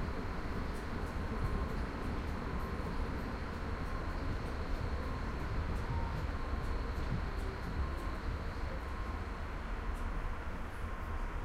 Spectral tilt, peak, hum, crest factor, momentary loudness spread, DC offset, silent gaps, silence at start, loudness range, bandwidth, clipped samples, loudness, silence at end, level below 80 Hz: -7 dB/octave; -24 dBFS; none; 14 dB; 4 LU; under 0.1%; none; 0 s; 2 LU; 14 kHz; under 0.1%; -40 LUFS; 0 s; -40 dBFS